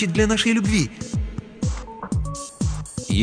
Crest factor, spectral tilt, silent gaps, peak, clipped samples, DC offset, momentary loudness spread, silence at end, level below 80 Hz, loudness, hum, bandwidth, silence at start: 16 dB; -5 dB/octave; none; -6 dBFS; under 0.1%; under 0.1%; 12 LU; 0 s; -32 dBFS; -24 LUFS; none; 10 kHz; 0 s